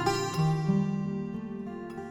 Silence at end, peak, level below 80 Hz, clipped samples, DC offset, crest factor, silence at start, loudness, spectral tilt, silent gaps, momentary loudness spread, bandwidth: 0 s; -14 dBFS; -58 dBFS; under 0.1%; under 0.1%; 16 dB; 0 s; -31 LUFS; -6.5 dB/octave; none; 11 LU; 16.5 kHz